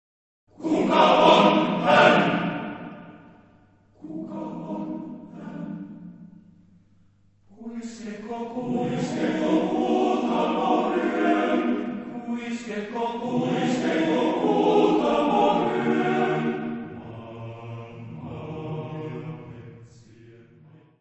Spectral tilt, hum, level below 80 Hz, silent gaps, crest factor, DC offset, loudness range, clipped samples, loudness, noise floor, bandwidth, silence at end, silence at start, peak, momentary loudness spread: -6 dB/octave; none; -64 dBFS; none; 22 dB; under 0.1%; 17 LU; under 0.1%; -23 LUFS; -59 dBFS; 8.4 kHz; 0.7 s; 0.6 s; -4 dBFS; 21 LU